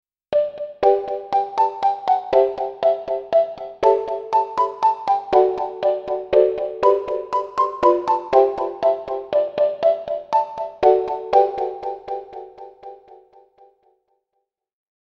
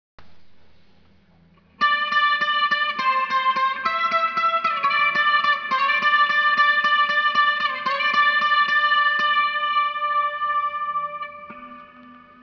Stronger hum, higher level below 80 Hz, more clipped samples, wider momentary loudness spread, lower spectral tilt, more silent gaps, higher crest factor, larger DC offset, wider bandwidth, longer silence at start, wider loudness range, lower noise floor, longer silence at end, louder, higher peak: neither; first, -56 dBFS vs -68 dBFS; neither; about the same, 9 LU vs 7 LU; first, -6 dB/octave vs -1.5 dB/octave; neither; about the same, 18 dB vs 14 dB; neither; first, 7.4 kHz vs 5.4 kHz; about the same, 0.3 s vs 0.2 s; about the same, 5 LU vs 4 LU; first, -76 dBFS vs -56 dBFS; first, 1.95 s vs 0.25 s; about the same, -20 LUFS vs -19 LUFS; first, -2 dBFS vs -8 dBFS